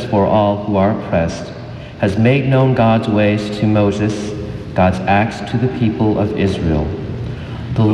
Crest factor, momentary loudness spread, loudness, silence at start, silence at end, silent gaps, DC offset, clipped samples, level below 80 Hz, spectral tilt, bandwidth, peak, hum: 14 dB; 12 LU; -16 LUFS; 0 s; 0 s; none; under 0.1%; under 0.1%; -36 dBFS; -7.5 dB/octave; 10 kHz; -2 dBFS; none